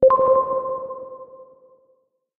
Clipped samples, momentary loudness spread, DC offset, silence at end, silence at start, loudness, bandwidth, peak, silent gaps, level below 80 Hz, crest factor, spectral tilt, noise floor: under 0.1%; 24 LU; under 0.1%; 0.95 s; 0 s; -20 LUFS; 2.5 kHz; -6 dBFS; none; -56 dBFS; 16 dB; -10 dB/octave; -65 dBFS